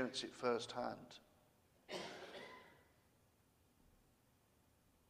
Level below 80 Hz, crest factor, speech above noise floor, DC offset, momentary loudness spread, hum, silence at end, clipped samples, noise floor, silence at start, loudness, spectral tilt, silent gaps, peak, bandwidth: -82 dBFS; 24 dB; 31 dB; under 0.1%; 20 LU; none; 2.25 s; under 0.1%; -75 dBFS; 0 s; -46 LUFS; -3.5 dB/octave; none; -24 dBFS; 15.5 kHz